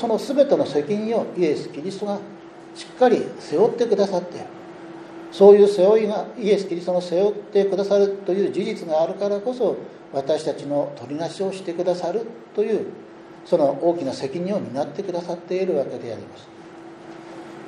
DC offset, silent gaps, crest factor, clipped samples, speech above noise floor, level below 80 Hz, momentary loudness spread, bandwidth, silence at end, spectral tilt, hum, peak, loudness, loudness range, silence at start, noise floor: under 0.1%; none; 20 dB; under 0.1%; 20 dB; -72 dBFS; 20 LU; 10.5 kHz; 0 s; -6.5 dB/octave; none; 0 dBFS; -21 LUFS; 8 LU; 0 s; -41 dBFS